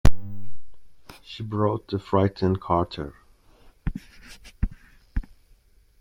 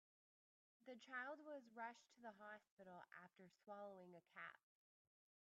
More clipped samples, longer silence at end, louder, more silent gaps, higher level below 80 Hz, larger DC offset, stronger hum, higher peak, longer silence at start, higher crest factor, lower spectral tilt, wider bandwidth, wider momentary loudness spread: neither; second, 0.75 s vs 0.9 s; first, -28 LUFS vs -59 LUFS; second, none vs 2.71-2.77 s; first, -34 dBFS vs under -90 dBFS; neither; neither; first, -2 dBFS vs -40 dBFS; second, 0.05 s vs 0.8 s; about the same, 20 dB vs 20 dB; first, -7.5 dB/octave vs -2.5 dB/octave; first, 16 kHz vs 7.4 kHz; first, 23 LU vs 11 LU